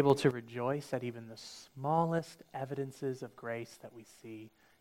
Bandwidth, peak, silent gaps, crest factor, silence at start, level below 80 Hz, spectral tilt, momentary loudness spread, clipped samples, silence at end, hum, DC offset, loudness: 16 kHz; -12 dBFS; none; 24 dB; 0 s; -76 dBFS; -6.5 dB/octave; 19 LU; under 0.1%; 0.35 s; none; under 0.1%; -36 LUFS